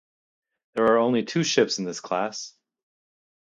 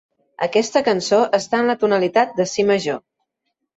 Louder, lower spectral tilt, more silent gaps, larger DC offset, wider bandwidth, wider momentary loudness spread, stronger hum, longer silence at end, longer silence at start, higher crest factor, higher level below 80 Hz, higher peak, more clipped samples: second, -24 LUFS vs -18 LUFS; about the same, -4 dB/octave vs -4 dB/octave; neither; neither; first, 9.2 kHz vs 8 kHz; first, 14 LU vs 5 LU; neither; first, 0.95 s vs 0.8 s; first, 0.75 s vs 0.4 s; first, 22 dB vs 16 dB; second, -70 dBFS vs -64 dBFS; about the same, -4 dBFS vs -4 dBFS; neither